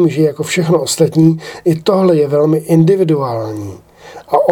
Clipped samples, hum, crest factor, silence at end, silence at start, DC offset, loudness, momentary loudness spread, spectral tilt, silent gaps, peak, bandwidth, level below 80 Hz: under 0.1%; none; 12 dB; 0 s; 0 s; under 0.1%; -13 LUFS; 9 LU; -6.5 dB/octave; none; 0 dBFS; 17 kHz; -54 dBFS